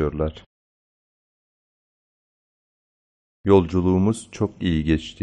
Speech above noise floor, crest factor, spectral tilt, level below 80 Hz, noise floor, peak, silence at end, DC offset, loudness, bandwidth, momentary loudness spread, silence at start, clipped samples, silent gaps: over 69 dB; 20 dB; -7.5 dB/octave; -40 dBFS; under -90 dBFS; -4 dBFS; 0.1 s; under 0.1%; -22 LUFS; 9.4 kHz; 10 LU; 0 s; under 0.1%; 0.46-3.44 s